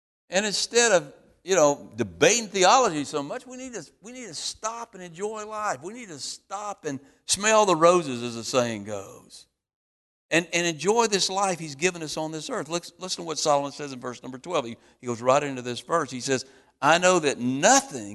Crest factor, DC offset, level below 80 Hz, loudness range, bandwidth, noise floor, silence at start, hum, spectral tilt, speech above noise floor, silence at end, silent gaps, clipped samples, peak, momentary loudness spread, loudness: 20 dB; under 0.1%; -64 dBFS; 9 LU; 12.5 kHz; under -90 dBFS; 0.3 s; none; -2.5 dB/octave; over 65 dB; 0 s; 9.75-10.29 s; under 0.1%; -4 dBFS; 18 LU; -24 LUFS